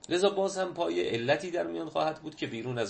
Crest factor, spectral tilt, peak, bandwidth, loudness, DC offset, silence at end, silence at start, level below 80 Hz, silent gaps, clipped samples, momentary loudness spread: 18 dB; -4.5 dB/octave; -12 dBFS; 8.8 kHz; -31 LUFS; under 0.1%; 0 s; 0.1 s; -68 dBFS; none; under 0.1%; 8 LU